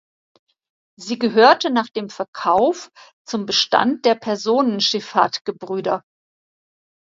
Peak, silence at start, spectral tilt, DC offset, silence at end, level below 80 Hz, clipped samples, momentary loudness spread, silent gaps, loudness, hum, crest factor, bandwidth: 0 dBFS; 1 s; -3.5 dB/octave; under 0.1%; 1.1 s; -66 dBFS; under 0.1%; 14 LU; 2.28-2.33 s, 3.13-3.25 s, 5.41-5.45 s; -19 LUFS; none; 20 dB; 7.8 kHz